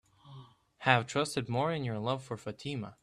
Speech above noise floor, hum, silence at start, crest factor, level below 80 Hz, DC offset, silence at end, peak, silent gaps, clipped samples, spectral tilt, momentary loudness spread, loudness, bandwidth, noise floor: 21 dB; none; 0.25 s; 26 dB; -68 dBFS; under 0.1%; 0.1 s; -8 dBFS; none; under 0.1%; -5 dB/octave; 13 LU; -33 LUFS; 13 kHz; -54 dBFS